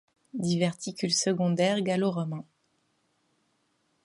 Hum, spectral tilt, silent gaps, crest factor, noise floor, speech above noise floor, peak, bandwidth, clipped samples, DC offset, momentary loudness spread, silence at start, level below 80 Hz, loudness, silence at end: none; -4.5 dB/octave; none; 18 dB; -73 dBFS; 45 dB; -12 dBFS; 11.5 kHz; under 0.1%; under 0.1%; 10 LU; 0.35 s; -74 dBFS; -28 LUFS; 1.65 s